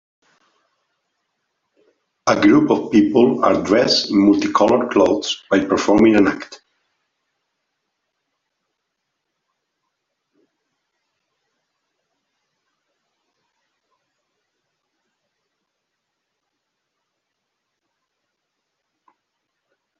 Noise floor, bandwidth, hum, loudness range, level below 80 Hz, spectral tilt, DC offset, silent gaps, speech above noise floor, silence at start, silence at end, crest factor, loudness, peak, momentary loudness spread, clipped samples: -77 dBFS; 7.6 kHz; none; 5 LU; -56 dBFS; -5 dB/octave; under 0.1%; none; 62 dB; 2.25 s; 13.45 s; 22 dB; -15 LUFS; 0 dBFS; 6 LU; under 0.1%